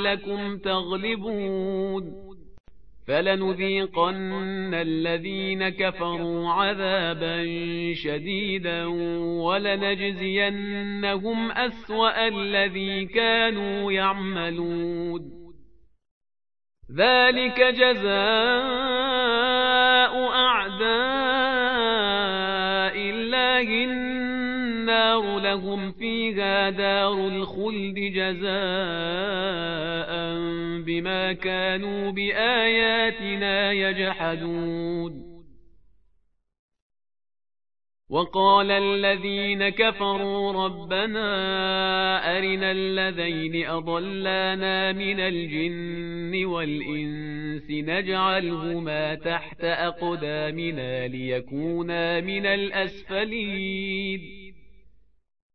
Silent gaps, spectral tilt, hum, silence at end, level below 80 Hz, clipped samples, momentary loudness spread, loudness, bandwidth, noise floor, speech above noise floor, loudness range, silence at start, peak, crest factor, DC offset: 2.60-2.64 s, 16.11-16.21 s, 36.59-36.69 s, 36.82-36.90 s, 55.42-55.50 s; -8 dB/octave; none; 0 s; -54 dBFS; under 0.1%; 9 LU; -24 LUFS; 5.6 kHz; -68 dBFS; 43 dB; 7 LU; 0 s; -6 dBFS; 20 dB; 0.6%